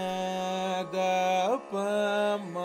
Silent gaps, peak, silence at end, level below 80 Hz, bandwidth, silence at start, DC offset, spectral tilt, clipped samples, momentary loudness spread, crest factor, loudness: none; -16 dBFS; 0 s; -76 dBFS; 16 kHz; 0 s; under 0.1%; -4.5 dB/octave; under 0.1%; 5 LU; 12 dB; -29 LUFS